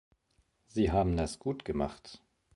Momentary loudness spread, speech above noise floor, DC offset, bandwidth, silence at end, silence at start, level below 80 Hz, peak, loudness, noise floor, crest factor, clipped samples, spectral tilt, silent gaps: 15 LU; 42 dB; under 0.1%; 11.5 kHz; 0.4 s; 0.75 s; -46 dBFS; -16 dBFS; -33 LUFS; -73 dBFS; 18 dB; under 0.1%; -7 dB/octave; none